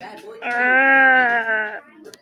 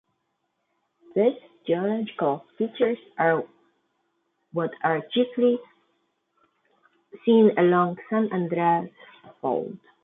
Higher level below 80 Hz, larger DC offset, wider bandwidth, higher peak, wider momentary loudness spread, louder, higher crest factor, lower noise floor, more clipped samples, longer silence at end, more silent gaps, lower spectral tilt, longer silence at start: about the same, -74 dBFS vs -76 dBFS; neither; first, 11 kHz vs 4 kHz; first, -4 dBFS vs -8 dBFS; first, 17 LU vs 12 LU; first, -15 LUFS vs -24 LUFS; about the same, 14 dB vs 18 dB; second, -38 dBFS vs -76 dBFS; neither; first, 0.4 s vs 0.25 s; neither; second, -3.5 dB/octave vs -10.5 dB/octave; second, 0 s vs 1.15 s